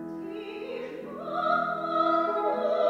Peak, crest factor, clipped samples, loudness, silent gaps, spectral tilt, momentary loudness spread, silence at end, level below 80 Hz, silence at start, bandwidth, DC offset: -12 dBFS; 16 dB; under 0.1%; -29 LUFS; none; -6.5 dB/octave; 12 LU; 0 s; -70 dBFS; 0 s; 7.8 kHz; under 0.1%